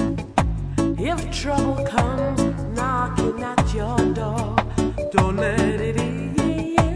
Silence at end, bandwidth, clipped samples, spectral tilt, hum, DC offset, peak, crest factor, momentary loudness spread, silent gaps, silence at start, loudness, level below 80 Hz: 0 s; 11 kHz; under 0.1%; -6 dB/octave; none; under 0.1%; 0 dBFS; 22 dB; 4 LU; none; 0 s; -22 LUFS; -32 dBFS